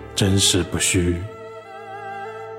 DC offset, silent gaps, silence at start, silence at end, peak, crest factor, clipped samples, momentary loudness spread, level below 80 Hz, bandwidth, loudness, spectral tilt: under 0.1%; none; 0 s; 0 s; -4 dBFS; 18 dB; under 0.1%; 20 LU; -42 dBFS; 16.5 kHz; -19 LUFS; -3.5 dB/octave